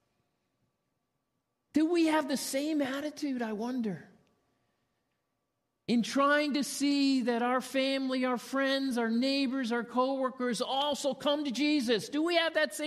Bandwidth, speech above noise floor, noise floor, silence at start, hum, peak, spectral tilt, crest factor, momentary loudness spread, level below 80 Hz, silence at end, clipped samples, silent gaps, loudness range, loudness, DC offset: 14 kHz; 52 dB; -82 dBFS; 1.75 s; none; -16 dBFS; -3.5 dB/octave; 16 dB; 7 LU; -80 dBFS; 0 s; under 0.1%; none; 6 LU; -30 LUFS; under 0.1%